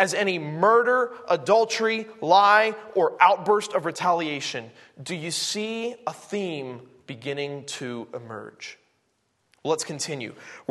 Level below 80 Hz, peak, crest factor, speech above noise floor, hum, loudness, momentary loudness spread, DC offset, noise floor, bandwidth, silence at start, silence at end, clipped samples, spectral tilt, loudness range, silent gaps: -76 dBFS; -2 dBFS; 22 dB; 47 dB; none; -23 LUFS; 19 LU; under 0.1%; -71 dBFS; 12.5 kHz; 0 s; 0.1 s; under 0.1%; -3.5 dB/octave; 13 LU; none